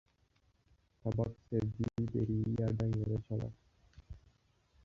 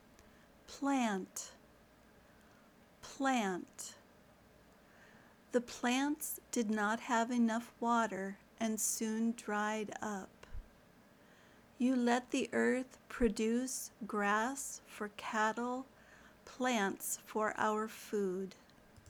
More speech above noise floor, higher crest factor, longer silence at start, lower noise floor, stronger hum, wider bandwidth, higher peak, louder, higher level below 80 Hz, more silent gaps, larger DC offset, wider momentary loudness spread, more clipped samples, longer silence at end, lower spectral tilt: first, 38 dB vs 28 dB; about the same, 18 dB vs 20 dB; first, 1.05 s vs 0.7 s; first, -73 dBFS vs -64 dBFS; neither; second, 7 kHz vs over 20 kHz; about the same, -20 dBFS vs -18 dBFS; about the same, -37 LUFS vs -37 LUFS; first, -56 dBFS vs -62 dBFS; neither; neither; first, 21 LU vs 14 LU; neither; first, 0.65 s vs 0 s; first, -10.5 dB/octave vs -3.5 dB/octave